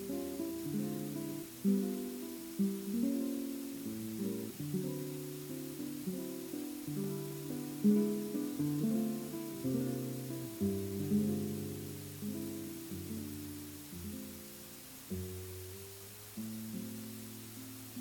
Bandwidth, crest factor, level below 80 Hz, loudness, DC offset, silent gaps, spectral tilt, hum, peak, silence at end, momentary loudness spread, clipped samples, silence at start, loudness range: 18 kHz; 20 dB; -70 dBFS; -39 LUFS; under 0.1%; none; -6 dB/octave; none; -18 dBFS; 0 s; 12 LU; under 0.1%; 0 s; 9 LU